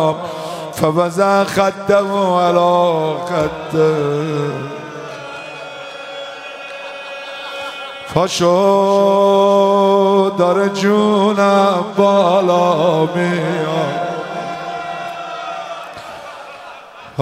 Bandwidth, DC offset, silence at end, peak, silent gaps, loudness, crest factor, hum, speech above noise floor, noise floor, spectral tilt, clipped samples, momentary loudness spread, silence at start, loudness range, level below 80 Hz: 15.5 kHz; under 0.1%; 0 s; 0 dBFS; none; -15 LUFS; 16 dB; none; 22 dB; -36 dBFS; -5.5 dB/octave; under 0.1%; 17 LU; 0 s; 13 LU; -56 dBFS